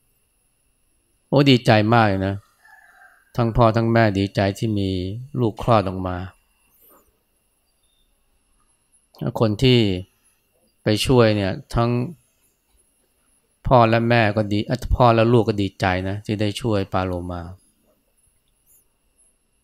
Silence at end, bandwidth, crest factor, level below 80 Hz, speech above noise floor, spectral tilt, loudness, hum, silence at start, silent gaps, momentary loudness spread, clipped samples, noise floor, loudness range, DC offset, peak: 2.1 s; 14.5 kHz; 20 dB; -40 dBFS; 48 dB; -7 dB/octave; -19 LUFS; none; 1.3 s; none; 14 LU; under 0.1%; -67 dBFS; 9 LU; under 0.1%; 0 dBFS